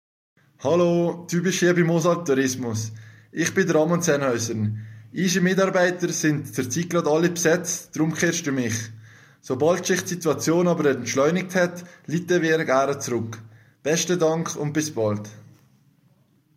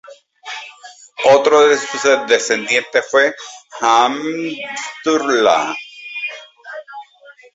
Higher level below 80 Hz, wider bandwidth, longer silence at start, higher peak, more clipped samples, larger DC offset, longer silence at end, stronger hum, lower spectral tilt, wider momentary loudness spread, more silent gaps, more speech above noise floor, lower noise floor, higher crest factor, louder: about the same, -66 dBFS vs -64 dBFS; first, 16 kHz vs 8 kHz; first, 0.6 s vs 0.1 s; second, -6 dBFS vs 0 dBFS; neither; neither; first, 1.15 s vs 0.25 s; neither; first, -5 dB/octave vs -2 dB/octave; second, 10 LU vs 21 LU; neither; first, 39 dB vs 30 dB; first, -61 dBFS vs -45 dBFS; about the same, 18 dB vs 16 dB; second, -22 LUFS vs -15 LUFS